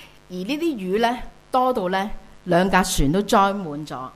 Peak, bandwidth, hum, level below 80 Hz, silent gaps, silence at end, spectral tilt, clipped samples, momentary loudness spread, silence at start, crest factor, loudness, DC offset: -4 dBFS; 15.5 kHz; none; -38 dBFS; none; 0.05 s; -5 dB/octave; under 0.1%; 14 LU; 0 s; 18 dB; -21 LUFS; under 0.1%